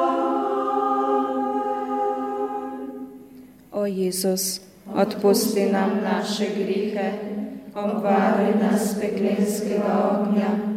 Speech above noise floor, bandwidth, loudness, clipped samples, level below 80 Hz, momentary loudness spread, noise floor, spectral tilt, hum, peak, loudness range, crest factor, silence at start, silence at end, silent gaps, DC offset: 24 dB; 16 kHz; -23 LUFS; under 0.1%; -66 dBFS; 11 LU; -46 dBFS; -5 dB/octave; none; -6 dBFS; 4 LU; 16 dB; 0 s; 0 s; none; under 0.1%